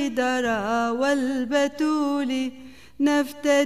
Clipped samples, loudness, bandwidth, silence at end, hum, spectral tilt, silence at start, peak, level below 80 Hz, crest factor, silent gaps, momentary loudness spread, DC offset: under 0.1%; -24 LUFS; 15 kHz; 0 s; none; -3.5 dB/octave; 0 s; -8 dBFS; -58 dBFS; 14 dB; none; 3 LU; 0.4%